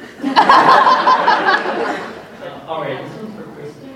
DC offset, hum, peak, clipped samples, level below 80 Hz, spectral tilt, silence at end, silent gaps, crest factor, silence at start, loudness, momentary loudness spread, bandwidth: under 0.1%; none; 0 dBFS; under 0.1%; -58 dBFS; -4 dB/octave; 0 s; none; 16 dB; 0 s; -12 LUFS; 23 LU; 12.5 kHz